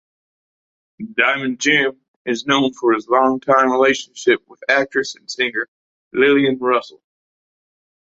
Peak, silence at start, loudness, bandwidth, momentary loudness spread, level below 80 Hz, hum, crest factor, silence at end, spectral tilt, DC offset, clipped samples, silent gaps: -2 dBFS; 1 s; -17 LUFS; 8 kHz; 10 LU; -62 dBFS; none; 18 dB; 1.2 s; -3.5 dB/octave; under 0.1%; under 0.1%; 2.08-2.25 s, 5.68-6.11 s